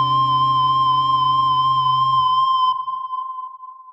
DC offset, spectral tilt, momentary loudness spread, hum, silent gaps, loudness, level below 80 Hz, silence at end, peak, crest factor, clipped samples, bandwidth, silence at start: under 0.1%; -5.5 dB/octave; 11 LU; none; none; -17 LUFS; -58 dBFS; 0 s; -10 dBFS; 8 dB; under 0.1%; 7.8 kHz; 0 s